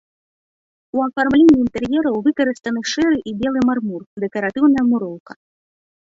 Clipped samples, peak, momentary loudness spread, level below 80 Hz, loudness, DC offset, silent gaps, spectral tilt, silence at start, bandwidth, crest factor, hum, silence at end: under 0.1%; -2 dBFS; 13 LU; -50 dBFS; -18 LUFS; under 0.1%; 4.06-4.17 s, 5.20-5.26 s; -5.5 dB/octave; 0.95 s; 7.8 kHz; 16 dB; none; 0.8 s